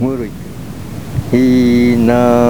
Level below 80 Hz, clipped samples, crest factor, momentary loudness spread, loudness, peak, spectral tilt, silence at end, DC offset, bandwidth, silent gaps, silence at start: -34 dBFS; under 0.1%; 12 dB; 18 LU; -12 LUFS; 0 dBFS; -7.5 dB/octave; 0 s; 2%; 19.5 kHz; none; 0 s